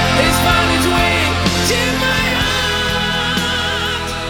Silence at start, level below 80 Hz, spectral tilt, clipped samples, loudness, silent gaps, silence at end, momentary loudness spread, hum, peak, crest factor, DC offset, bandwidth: 0 s; -28 dBFS; -3.5 dB/octave; under 0.1%; -14 LUFS; none; 0 s; 4 LU; none; -2 dBFS; 14 dB; under 0.1%; 19 kHz